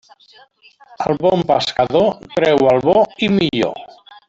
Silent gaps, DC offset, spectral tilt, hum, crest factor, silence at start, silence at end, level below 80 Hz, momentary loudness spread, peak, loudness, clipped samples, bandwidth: none; under 0.1%; -6 dB/octave; none; 14 dB; 1 s; 0.4 s; -50 dBFS; 8 LU; -2 dBFS; -16 LUFS; under 0.1%; 8 kHz